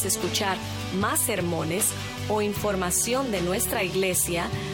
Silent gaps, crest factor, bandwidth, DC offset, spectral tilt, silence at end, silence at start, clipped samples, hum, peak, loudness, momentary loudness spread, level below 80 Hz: none; 16 dB; 18 kHz; under 0.1%; -3.5 dB/octave; 0 s; 0 s; under 0.1%; none; -10 dBFS; -25 LUFS; 5 LU; -46 dBFS